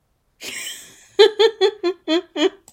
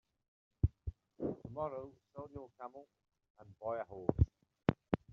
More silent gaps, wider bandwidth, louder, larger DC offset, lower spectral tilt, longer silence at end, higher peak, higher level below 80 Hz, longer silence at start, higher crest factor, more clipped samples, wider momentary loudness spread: second, none vs 3.30-3.35 s; first, 16 kHz vs 5.4 kHz; first, -19 LUFS vs -40 LUFS; neither; second, -1.5 dB/octave vs -8.5 dB/octave; about the same, 0.2 s vs 0.15 s; first, 0 dBFS vs -12 dBFS; second, -68 dBFS vs -48 dBFS; second, 0.4 s vs 0.65 s; second, 20 dB vs 30 dB; neither; about the same, 17 LU vs 16 LU